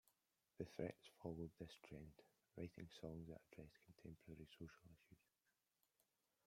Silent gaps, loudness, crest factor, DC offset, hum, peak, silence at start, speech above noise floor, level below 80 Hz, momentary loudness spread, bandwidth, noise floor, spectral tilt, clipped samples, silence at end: none; -57 LUFS; 24 dB; under 0.1%; none; -34 dBFS; 0.6 s; 33 dB; -76 dBFS; 12 LU; 16 kHz; -89 dBFS; -7 dB/octave; under 0.1%; 1.3 s